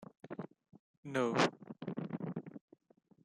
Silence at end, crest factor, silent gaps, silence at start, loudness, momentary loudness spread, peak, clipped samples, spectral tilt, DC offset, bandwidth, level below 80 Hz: 0.65 s; 24 dB; 0.79-1.03 s; 0 s; -38 LUFS; 21 LU; -16 dBFS; under 0.1%; -5.5 dB/octave; under 0.1%; 12 kHz; -80 dBFS